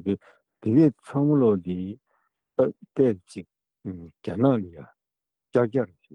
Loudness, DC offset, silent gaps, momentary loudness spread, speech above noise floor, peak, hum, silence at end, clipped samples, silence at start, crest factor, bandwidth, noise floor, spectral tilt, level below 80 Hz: -24 LUFS; under 0.1%; none; 19 LU; 64 dB; -8 dBFS; none; 0.3 s; under 0.1%; 0.05 s; 18 dB; 10 kHz; -88 dBFS; -9.5 dB/octave; -68 dBFS